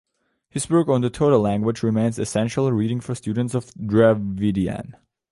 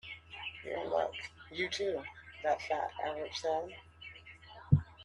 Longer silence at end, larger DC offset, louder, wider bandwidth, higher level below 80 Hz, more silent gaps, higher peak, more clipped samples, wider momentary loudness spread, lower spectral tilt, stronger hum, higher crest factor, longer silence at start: first, 0.4 s vs 0 s; neither; first, -21 LUFS vs -36 LUFS; about the same, 11.5 kHz vs 11 kHz; first, -48 dBFS vs -56 dBFS; neither; first, -4 dBFS vs -12 dBFS; neither; second, 10 LU vs 18 LU; about the same, -7 dB/octave vs -6 dB/octave; neither; second, 18 dB vs 26 dB; first, 0.55 s vs 0.05 s